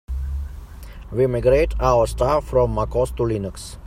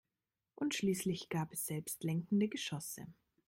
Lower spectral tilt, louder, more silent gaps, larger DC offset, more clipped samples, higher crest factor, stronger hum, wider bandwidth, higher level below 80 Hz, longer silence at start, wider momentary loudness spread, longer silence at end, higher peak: first, -7 dB/octave vs -5 dB/octave; first, -20 LUFS vs -38 LUFS; neither; neither; neither; about the same, 18 dB vs 16 dB; neither; about the same, 15.5 kHz vs 16 kHz; first, -30 dBFS vs -74 dBFS; second, 0.1 s vs 0.6 s; first, 16 LU vs 9 LU; second, 0 s vs 0.35 s; first, -4 dBFS vs -24 dBFS